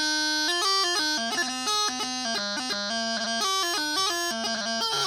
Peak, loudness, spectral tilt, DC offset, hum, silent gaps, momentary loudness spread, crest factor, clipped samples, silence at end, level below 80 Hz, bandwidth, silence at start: -14 dBFS; -25 LUFS; 0 dB/octave; under 0.1%; none; none; 5 LU; 14 dB; under 0.1%; 0 s; -66 dBFS; over 20 kHz; 0 s